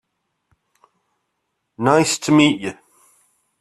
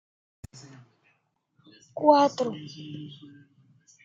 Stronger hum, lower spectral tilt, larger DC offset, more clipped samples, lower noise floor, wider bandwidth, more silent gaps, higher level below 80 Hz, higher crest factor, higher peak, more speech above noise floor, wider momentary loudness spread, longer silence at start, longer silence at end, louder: neither; about the same, -4.5 dB/octave vs -5.5 dB/octave; neither; neither; about the same, -74 dBFS vs -72 dBFS; first, 13.5 kHz vs 7.8 kHz; neither; first, -60 dBFS vs -70 dBFS; about the same, 20 dB vs 24 dB; first, -2 dBFS vs -6 dBFS; first, 58 dB vs 47 dB; second, 11 LU vs 28 LU; second, 1.8 s vs 1.95 s; about the same, 0.85 s vs 0.9 s; first, -16 LUFS vs -23 LUFS